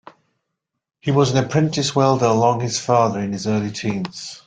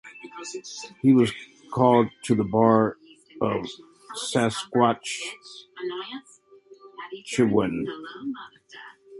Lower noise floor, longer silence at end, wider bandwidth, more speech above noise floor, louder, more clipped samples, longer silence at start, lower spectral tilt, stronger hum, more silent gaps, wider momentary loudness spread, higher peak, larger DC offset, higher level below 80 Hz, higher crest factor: first, -79 dBFS vs -51 dBFS; about the same, 0.1 s vs 0 s; second, 9.4 kHz vs 11.5 kHz; first, 60 dB vs 27 dB; first, -19 LUFS vs -24 LUFS; neither; first, 1.05 s vs 0.05 s; about the same, -5.5 dB/octave vs -5.5 dB/octave; neither; neither; second, 8 LU vs 22 LU; first, -2 dBFS vs -6 dBFS; neither; first, -54 dBFS vs -60 dBFS; about the same, 18 dB vs 20 dB